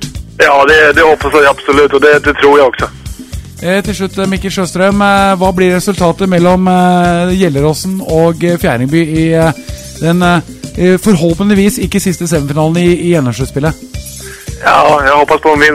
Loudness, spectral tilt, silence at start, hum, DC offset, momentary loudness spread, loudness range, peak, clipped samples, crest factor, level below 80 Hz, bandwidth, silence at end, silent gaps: -9 LUFS; -5.5 dB/octave; 0 s; none; under 0.1%; 12 LU; 4 LU; 0 dBFS; 0.8%; 10 dB; -30 dBFS; 16 kHz; 0 s; none